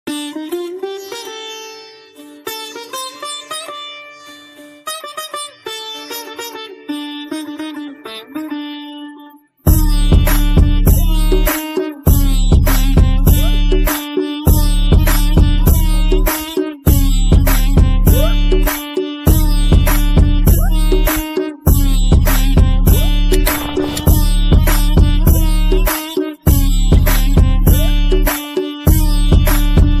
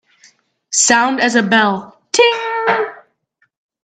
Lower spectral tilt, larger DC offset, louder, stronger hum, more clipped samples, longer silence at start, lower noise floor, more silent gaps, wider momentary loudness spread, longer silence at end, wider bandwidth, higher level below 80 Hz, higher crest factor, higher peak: first, -5.5 dB/octave vs -2 dB/octave; neither; about the same, -15 LUFS vs -14 LUFS; neither; neither; second, 0.05 s vs 0.7 s; second, -40 dBFS vs -63 dBFS; neither; first, 14 LU vs 8 LU; second, 0 s vs 0.9 s; first, 16 kHz vs 9.4 kHz; first, -14 dBFS vs -66 dBFS; about the same, 12 dB vs 16 dB; about the same, 0 dBFS vs 0 dBFS